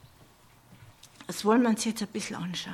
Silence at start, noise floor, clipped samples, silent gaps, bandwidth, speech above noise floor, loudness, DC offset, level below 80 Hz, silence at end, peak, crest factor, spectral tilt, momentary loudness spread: 0.7 s; -57 dBFS; under 0.1%; none; 16 kHz; 30 dB; -28 LUFS; under 0.1%; -68 dBFS; 0 s; -10 dBFS; 20 dB; -4.5 dB/octave; 13 LU